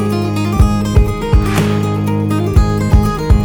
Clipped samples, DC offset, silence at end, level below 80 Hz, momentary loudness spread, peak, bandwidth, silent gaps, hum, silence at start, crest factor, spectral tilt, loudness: under 0.1%; under 0.1%; 0 s; -16 dBFS; 3 LU; 0 dBFS; 20 kHz; none; none; 0 s; 12 dB; -7 dB/octave; -14 LUFS